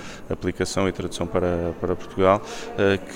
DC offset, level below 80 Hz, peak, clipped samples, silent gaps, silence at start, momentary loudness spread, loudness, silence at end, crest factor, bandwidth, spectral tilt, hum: under 0.1%; -46 dBFS; -4 dBFS; under 0.1%; none; 0 s; 9 LU; -24 LUFS; 0 s; 20 dB; 16 kHz; -5.5 dB/octave; none